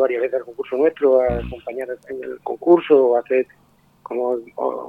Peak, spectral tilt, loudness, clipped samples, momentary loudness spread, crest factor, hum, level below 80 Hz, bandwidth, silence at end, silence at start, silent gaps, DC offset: -2 dBFS; -8.5 dB/octave; -20 LUFS; under 0.1%; 14 LU; 18 dB; none; -44 dBFS; 4.5 kHz; 0 s; 0 s; none; under 0.1%